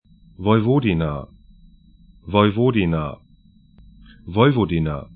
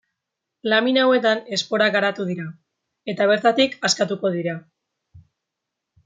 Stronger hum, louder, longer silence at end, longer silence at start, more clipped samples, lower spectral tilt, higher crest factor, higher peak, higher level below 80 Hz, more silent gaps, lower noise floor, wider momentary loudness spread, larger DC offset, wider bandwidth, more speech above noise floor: neither; about the same, -19 LUFS vs -20 LUFS; second, 0.1 s vs 0.85 s; second, 0.4 s vs 0.65 s; neither; first, -12 dB/octave vs -3.5 dB/octave; about the same, 20 dB vs 18 dB; first, 0 dBFS vs -4 dBFS; first, -42 dBFS vs -70 dBFS; neither; second, -52 dBFS vs -82 dBFS; second, 10 LU vs 14 LU; neither; second, 4.6 kHz vs 9.6 kHz; second, 34 dB vs 62 dB